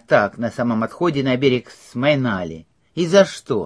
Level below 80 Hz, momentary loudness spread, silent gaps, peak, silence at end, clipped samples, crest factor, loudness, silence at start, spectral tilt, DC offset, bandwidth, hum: -54 dBFS; 15 LU; none; 0 dBFS; 0 s; under 0.1%; 18 dB; -19 LUFS; 0.1 s; -6 dB/octave; under 0.1%; 11 kHz; none